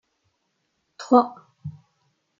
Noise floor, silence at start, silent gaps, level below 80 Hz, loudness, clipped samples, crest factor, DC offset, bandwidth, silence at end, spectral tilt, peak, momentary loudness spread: -74 dBFS; 1 s; none; -68 dBFS; -20 LUFS; under 0.1%; 24 dB; under 0.1%; 7.4 kHz; 0.7 s; -7 dB/octave; -2 dBFS; 22 LU